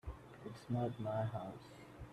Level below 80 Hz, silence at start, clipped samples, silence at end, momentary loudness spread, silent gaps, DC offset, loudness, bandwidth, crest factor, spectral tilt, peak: -60 dBFS; 0.05 s; under 0.1%; 0 s; 15 LU; none; under 0.1%; -43 LUFS; 12.5 kHz; 16 dB; -8 dB/octave; -26 dBFS